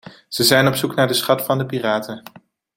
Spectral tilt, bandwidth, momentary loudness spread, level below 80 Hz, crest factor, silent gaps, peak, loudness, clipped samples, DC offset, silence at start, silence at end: -4 dB/octave; 17 kHz; 15 LU; -58 dBFS; 18 dB; none; -2 dBFS; -17 LUFS; under 0.1%; under 0.1%; 0.05 s; 0.6 s